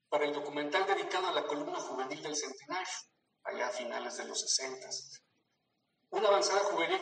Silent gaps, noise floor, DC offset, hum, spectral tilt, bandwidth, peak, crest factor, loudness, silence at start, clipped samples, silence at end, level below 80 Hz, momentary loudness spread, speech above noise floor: none; -80 dBFS; under 0.1%; none; -1 dB/octave; 9.4 kHz; -14 dBFS; 22 dB; -34 LUFS; 0.1 s; under 0.1%; 0 s; under -90 dBFS; 12 LU; 46 dB